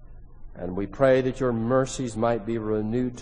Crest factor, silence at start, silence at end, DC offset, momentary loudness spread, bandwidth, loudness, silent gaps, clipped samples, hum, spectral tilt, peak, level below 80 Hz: 18 dB; 0 s; 0 s; under 0.1%; 11 LU; 10 kHz; -25 LUFS; none; under 0.1%; none; -6.5 dB/octave; -6 dBFS; -42 dBFS